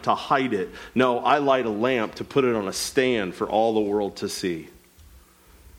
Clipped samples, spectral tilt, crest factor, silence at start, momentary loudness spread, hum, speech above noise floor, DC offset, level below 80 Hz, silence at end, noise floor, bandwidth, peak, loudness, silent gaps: under 0.1%; -4.5 dB/octave; 18 dB; 0 s; 8 LU; none; 29 dB; under 0.1%; -56 dBFS; 1.1 s; -52 dBFS; 16.5 kHz; -6 dBFS; -23 LUFS; none